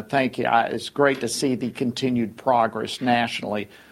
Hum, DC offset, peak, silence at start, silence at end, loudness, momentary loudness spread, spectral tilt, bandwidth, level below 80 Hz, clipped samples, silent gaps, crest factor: none; under 0.1%; -4 dBFS; 0 s; 0.25 s; -23 LUFS; 6 LU; -4.5 dB/octave; 15.5 kHz; -60 dBFS; under 0.1%; none; 18 dB